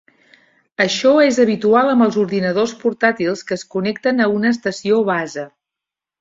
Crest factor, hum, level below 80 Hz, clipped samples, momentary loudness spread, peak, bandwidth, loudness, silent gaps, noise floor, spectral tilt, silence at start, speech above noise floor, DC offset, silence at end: 16 dB; none; -62 dBFS; under 0.1%; 11 LU; -2 dBFS; 7.8 kHz; -16 LUFS; none; -86 dBFS; -5 dB/octave; 0.8 s; 70 dB; under 0.1%; 0.7 s